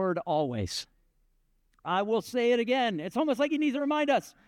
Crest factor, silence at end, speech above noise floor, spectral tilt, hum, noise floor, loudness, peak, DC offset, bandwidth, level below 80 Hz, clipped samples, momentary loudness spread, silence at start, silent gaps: 14 dB; 0.15 s; 41 dB; -5 dB/octave; none; -69 dBFS; -28 LUFS; -14 dBFS; under 0.1%; 16 kHz; -66 dBFS; under 0.1%; 8 LU; 0 s; none